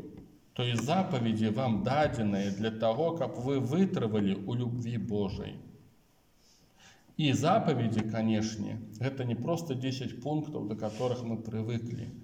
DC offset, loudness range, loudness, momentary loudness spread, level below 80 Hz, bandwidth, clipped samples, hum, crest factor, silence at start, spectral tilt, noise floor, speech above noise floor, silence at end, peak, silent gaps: under 0.1%; 5 LU; -32 LUFS; 8 LU; -62 dBFS; 16 kHz; under 0.1%; none; 16 dB; 0 s; -6.5 dB/octave; -65 dBFS; 35 dB; 0 s; -14 dBFS; none